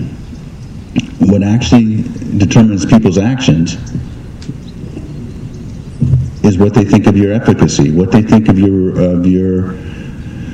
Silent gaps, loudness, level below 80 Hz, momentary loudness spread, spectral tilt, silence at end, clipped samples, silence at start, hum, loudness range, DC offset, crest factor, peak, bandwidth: none; -10 LUFS; -30 dBFS; 18 LU; -7 dB/octave; 0 s; 0.9%; 0 s; none; 7 LU; under 0.1%; 12 dB; 0 dBFS; 9.2 kHz